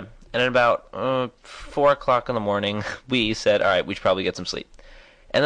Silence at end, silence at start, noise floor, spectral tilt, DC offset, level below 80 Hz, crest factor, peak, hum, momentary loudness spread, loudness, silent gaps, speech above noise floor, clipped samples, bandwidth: 0 s; 0 s; -48 dBFS; -4.5 dB/octave; under 0.1%; -48 dBFS; 16 dB; -8 dBFS; none; 12 LU; -22 LUFS; none; 25 dB; under 0.1%; 10 kHz